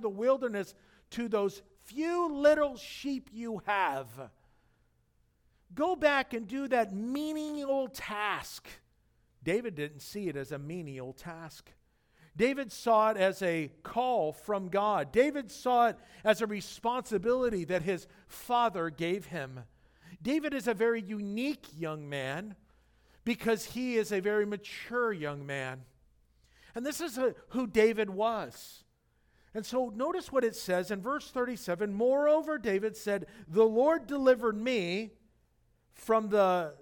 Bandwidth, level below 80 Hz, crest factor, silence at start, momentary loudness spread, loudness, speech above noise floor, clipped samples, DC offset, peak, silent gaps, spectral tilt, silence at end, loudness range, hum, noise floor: 19 kHz; -64 dBFS; 20 dB; 0 s; 14 LU; -31 LUFS; 40 dB; under 0.1%; under 0.1%; -12 dBFS; none; -5 dB/octave; 0.05 s; 6 LU; none; -71 dBFS